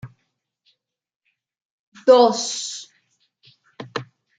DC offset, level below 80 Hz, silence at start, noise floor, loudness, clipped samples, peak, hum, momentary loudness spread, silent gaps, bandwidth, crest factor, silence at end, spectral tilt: under 0.1%; -72 dBFS; 0.05 s; -74 dBFS; -18 LUFS; under 0.1%; -2 dBFS; none; 20 LU; 1.16-1.20 s, 1.65-1.92 s; 9.4 kHz; 22 dB; 0.35 s; -3 dB/octave